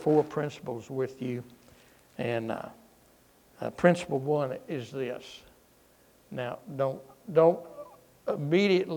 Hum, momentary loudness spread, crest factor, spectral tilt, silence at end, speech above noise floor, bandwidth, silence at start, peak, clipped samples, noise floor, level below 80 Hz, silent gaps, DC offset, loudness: none; 19 LU; 24 dB; -7 dB/octave; 0 s; 33 dB; 19 kHz; 0 s; -8 dBFS; under 0.1%; -61 dBFS; -68 dBFS; none; under 0.1%; -30 LUFS